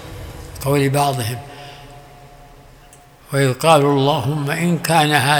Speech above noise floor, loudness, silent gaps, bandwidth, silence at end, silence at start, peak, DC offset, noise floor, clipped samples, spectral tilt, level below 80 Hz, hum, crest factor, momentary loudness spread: 29 dB; -17 LUFS; none; over 20 kHz; 0 s; 0 s; 0 dBFS; under 0.1%; -45 dBFS; under 0.1%; -5 dB/octave; -46 dBFS; none; 18 dB; 21 LU